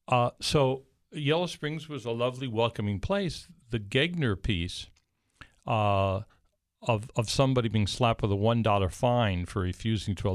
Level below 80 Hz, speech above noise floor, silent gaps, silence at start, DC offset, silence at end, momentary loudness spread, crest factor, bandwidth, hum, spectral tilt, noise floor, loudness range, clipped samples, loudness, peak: -48 dBFS; 29 dB; none; 0.1 s; under 0.1%; 0 s; 10 LU; 18 dB; 13.5 kHz; none; -6 dB/octave; -57 dBFS; 4 LU; under 0.1%; -29 LUFS; -10 dBFS